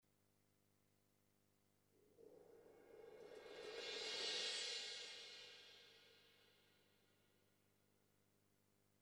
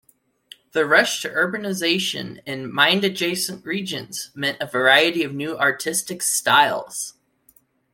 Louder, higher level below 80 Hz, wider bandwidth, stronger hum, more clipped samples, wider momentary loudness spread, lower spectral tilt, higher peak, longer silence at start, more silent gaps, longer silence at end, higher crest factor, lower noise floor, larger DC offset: second, -48 LUFS vs -20 LUFS; second, under -90 dBFS vs -68 dBFS; first, over 20 kHz vs 16.5 kHz; first, 50 Hz at -85 dBFS vs none; neither; first, 24 LU vs 13 LU; second, 0.5 dB/octave vs -2 dB/octave; second, -34 dBFS vs -2 dBFS; first, 1.95 s vs 0.75 s; neither; first, 2.2 s vs 0.85 s; about the same, 22 dB vs 20 dB; first, -82 dBFS vs -59 dBFS; neither